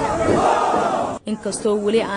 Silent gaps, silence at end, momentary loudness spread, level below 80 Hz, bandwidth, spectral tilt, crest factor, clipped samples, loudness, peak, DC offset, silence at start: none; 0 s; 9 LU; -44 dBFS; 10.5 kHz; -5 dB/octave; 14 dB; under 0.1%; -19 LUFS; -6 dBFS; under 0.1%; 0 s